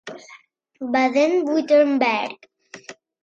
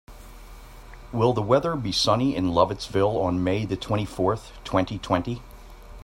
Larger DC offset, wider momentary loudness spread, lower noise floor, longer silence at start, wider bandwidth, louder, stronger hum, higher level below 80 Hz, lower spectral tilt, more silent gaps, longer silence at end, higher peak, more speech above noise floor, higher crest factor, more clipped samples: neither; first, 23 LU vs 6 LU; first, -50 dBFS vs -43 dBFS; about the same, 0.05 s vs 0.1 s; second, 7.6 kHz vs 16 kHz; first, -19 LUFS vs -24 LUFS; neither; second, -72 dBFS vs -44 dBFS; second, -4 dB/octave vs -6 dB/octave; neither; first, 0.3 s vs 0 s; about the same, -6 dBFS vs -4 dBFS; first, 31 dB vs 20 dB; about the same, 16 dB vs 20 dB; neither